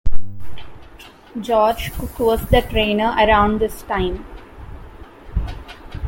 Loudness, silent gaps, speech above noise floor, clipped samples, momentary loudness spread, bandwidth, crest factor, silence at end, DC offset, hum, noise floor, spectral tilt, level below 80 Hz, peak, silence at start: -19 LUFS; none; 24 dB; under 0.1%; 24 LU; 17 kHz; 18 dB; 0 s; under 0.1%; none; -42 dBFS; -6 dB/octave; -30 dBFS; 0 dBFS; 0.05 s